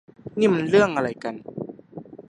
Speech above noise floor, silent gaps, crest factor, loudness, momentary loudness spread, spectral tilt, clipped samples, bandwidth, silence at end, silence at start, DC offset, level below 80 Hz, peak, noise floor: 20 dB; none; 20 dB; -22 LUFS; 19 LU; -6.5 dB/octave; under 0.1%; 10 kHz; 0.1 s; 0.25 s; under 0.1%; -60 dBFS; -4 dBFS; -41 dBFS